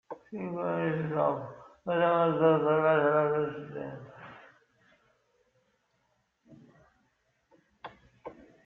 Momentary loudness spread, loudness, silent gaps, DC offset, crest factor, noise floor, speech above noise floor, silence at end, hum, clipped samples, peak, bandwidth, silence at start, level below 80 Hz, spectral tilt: 25 LU; -28 LUFS; none; under 0.1%; 20 dB; -75 dBFS; 47 dB; 0.35 s; none; under 0.1%; -12 dBFS; 4.1 kHz; 0.1 s; -72 dBFS; -9 dB/octave